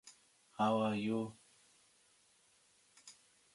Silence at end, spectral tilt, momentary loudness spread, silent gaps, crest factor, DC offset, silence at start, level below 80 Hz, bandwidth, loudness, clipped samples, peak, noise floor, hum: 0.45 s; -6 dB/octave; 25 LU; none; 20 dB; under 0.1%; 0.05 s; -80 dBFS; 11.5 kHz; -37 LUFS; under 0.1%; -22 dBFS; -71 dBFS; none